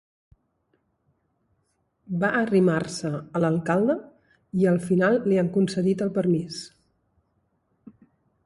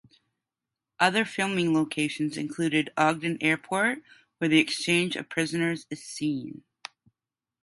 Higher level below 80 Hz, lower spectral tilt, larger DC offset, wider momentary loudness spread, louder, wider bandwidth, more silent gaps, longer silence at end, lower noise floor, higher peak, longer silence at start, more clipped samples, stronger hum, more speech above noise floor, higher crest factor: first, -64 dBFS vs -72 dBFS; first, -7 dB/octave vs -4.5 dB/octave; neither; second, 10 LU vs 14 LU; about the same, -24 LUFS vs -26 LUFS; about the same, 11.5 kHz vs 11.5 kHz; neither; first, 1.8 s vs 1.1 s; second, -72 dBFS vs under -90 dBFS; about the same, -8 dBFS vs -6 dBFS; first, 2.1 s vs 1 s; neither; neither; second, 49 dB vs over 63 dB; second, 16 dB vs 22 dB